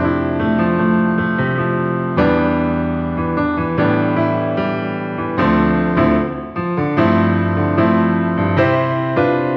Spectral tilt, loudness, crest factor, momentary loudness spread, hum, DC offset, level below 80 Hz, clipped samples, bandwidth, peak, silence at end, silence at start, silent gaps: -10 dB/octave; -17 LUFS; 14 dB; 5 LU; none; under 0.1%; -38 dBFS; under 0.1%; 5.8 kHz; -2 dBFS; 0 s; 0 s; none